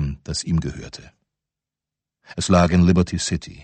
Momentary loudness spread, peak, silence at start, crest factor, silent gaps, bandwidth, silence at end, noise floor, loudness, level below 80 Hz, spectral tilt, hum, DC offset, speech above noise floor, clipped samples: 20 LU; -4 dBFS; 0 s; 18 dB; none; 8.8 kHz; 0 s; -87 dBFS; -20 LUFS; -38 dBFS; -5.5 dB/octave; none; under 0.1%; 68 dB; under 0.1%